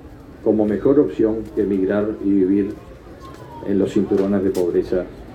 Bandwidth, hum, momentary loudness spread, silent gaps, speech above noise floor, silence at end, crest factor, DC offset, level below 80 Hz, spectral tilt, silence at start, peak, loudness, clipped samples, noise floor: 13 kHz; none; 17 LU; none; 20 dB; 0 s; 16 dB; under 0.1%; -44 dBFS; -8.5 dB/octave; 0 s; -2 dBFS; -19 LUFS; under 0.1%; -38 dBFS